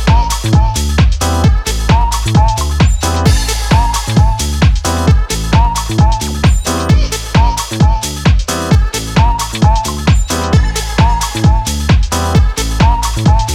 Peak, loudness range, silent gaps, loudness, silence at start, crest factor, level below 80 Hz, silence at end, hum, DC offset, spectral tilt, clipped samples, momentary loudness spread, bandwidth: 0 dBFS; 1 LU; none; -12 LUFS; 0 s; 10 dB; -14 dBFS; 0 s; none; under 0.1%; -5 dB/octave; under 0.1%; 2 LU; 16 kHz